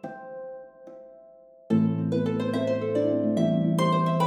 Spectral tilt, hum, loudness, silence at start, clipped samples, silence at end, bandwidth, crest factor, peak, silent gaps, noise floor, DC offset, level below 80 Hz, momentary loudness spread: -8 dB/octave; none; -25 LUFS; 0.05 s; under 0.1%; 0 s; 11.5 kHz; 16 dB; -10 dBFS; none; -52 dBFS; under 0.1%; -70 dBFS; 20 LU